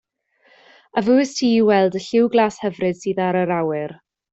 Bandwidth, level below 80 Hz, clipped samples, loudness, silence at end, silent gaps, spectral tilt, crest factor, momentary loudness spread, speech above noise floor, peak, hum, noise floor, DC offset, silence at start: 8 kHz; -62 dBFS; under 0.1%; -19 LUFS; 0.4 s; none; -5.5 dB/octave; 16 dB; 8 LU; 41 dB; -4 dBFS; none; -59 dBFS; under 0.1%; 0.95 s